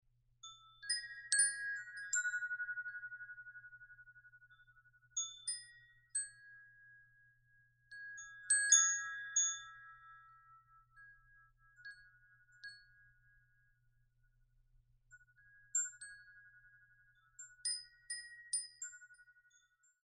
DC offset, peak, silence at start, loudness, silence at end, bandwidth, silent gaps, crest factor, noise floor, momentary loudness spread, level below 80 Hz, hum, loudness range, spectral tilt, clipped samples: under 0.1%; -16 dBFS; 0.45 s; -37 LUFS; 0.85 s; 9.6 kHz; none; 28 dB; -75 dBFS; 25 LU; -78 dBFS; none; 24 LU; 6 dB/octave; under 0.1%